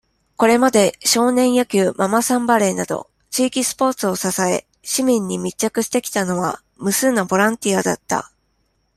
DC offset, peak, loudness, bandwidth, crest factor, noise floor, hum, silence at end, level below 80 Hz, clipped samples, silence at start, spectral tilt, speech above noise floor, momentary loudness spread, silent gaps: under 0.1%; -2 dBFS; -18 LUFS; 15.5 kHz; 18 dB; -66 dBFS; none; 0.7 s; -58 dBFS; under 0.1%; 0.4 s; -3.5 dB/octave; 48 dB; 9 LU; none